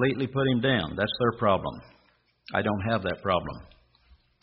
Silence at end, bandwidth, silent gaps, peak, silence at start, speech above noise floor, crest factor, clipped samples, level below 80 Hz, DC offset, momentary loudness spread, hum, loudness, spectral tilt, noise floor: 0.8 s; 5.6 kHz; none; -8 dBFS; 0 s; 39 dB; 20 dB; under 0.1%; -54 dBFS; under 0.1%; 12 LU; none; -27 LUFS; -4.5 dB/octave; -65 dBFS